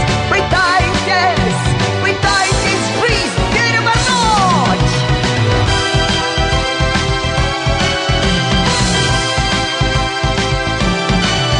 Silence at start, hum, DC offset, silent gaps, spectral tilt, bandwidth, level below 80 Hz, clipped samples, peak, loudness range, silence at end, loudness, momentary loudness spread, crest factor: 0 s; none; under 0.1%; none; -4 dB/octave; 11 kHz; -24 dBFS; under 0.1%; -2 dBFS; 1 LU; 0 s; -13 LUFS; 3 LU; 12 dB